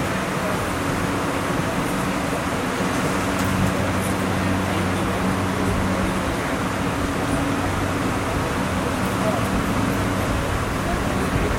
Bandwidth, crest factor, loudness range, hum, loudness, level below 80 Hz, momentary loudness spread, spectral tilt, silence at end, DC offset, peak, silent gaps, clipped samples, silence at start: 16.5 kHz; 14 dB; 1 LU; none; -22 LUFS; -34 dBFS; 2 LU; -5.5 dB/octave; 0 s; under 0.1%; -8 dBFS; none; under 0.1%; 0 s